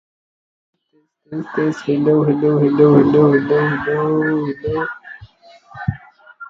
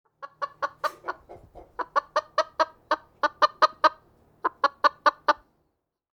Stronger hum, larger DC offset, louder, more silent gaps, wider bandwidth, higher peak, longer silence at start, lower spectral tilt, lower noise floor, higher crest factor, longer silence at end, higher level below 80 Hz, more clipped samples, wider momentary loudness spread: neither; neither; first, -16 LUFS vs -26 LUFS; neither; second, 7.2 kHz vs 18.5 kHz; first, 0 dBFS vs -4 dBFS; first, 1.3 s vs 0.2 s; first, -9 dB/octave vs -2 dB/octave; second, -45 dBFS vs -77 dBFS; second, 16 dB vs 22 dB; second, 0.05 s vs 0.8 s; first, -48 dBFS vs -66 dBFS; neither; about the same, 15 LU vs 15 LU